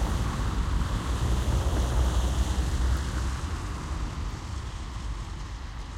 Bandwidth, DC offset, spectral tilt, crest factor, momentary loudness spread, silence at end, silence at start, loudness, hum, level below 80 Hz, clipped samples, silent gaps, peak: 13.5 kHz; under 0.1%; -5.5 dB/octave; 14 dB; 10 LU; 0 s; 0 s; -30 LUFS; none; -30 dBFS; under 0.1%; none; -14 dBFS